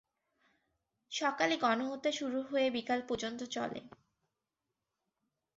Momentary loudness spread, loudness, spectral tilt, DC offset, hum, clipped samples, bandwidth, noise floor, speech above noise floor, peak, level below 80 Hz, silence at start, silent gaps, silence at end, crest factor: 8 LU; -35 LUFS; -1.5 dB/octave; under 0.1%; none; under 0.1%; 7.6 kHz; -89 dBFS; 54 dB; -16 dBFS; -76 dBFS; 1.1 s; none; 1.7 s; 20 dB